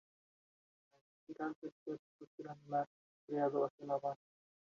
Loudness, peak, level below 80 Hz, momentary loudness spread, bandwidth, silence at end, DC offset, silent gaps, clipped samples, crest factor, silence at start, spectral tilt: -42 LUFS; -24 dBFS; under -90 dBFS; 16 LU; 7.2 kHz; 0.55 s; under 0.1%; 1.56-1.62 s, 1.72-1.86 s, 1.99-2.19 s, 2.27-2.38 s, 2.87-3.28 s, 3.70-3.78 s; under 0.1%; 20 dB; 1.3 s; -7 dB/octave